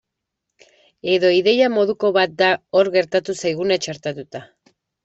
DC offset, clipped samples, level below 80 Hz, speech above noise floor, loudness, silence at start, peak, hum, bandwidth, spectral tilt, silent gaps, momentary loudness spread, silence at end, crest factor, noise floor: under 0.1%; under 0.1%; -64 dBFS; 62 dB; -18 LUFS; 1.05 s; -4 dBFS; none; 8.2 kHz; -4.5 dB/octave; none; 14 LU; 0.6 s; 16 dB; -80 dBFS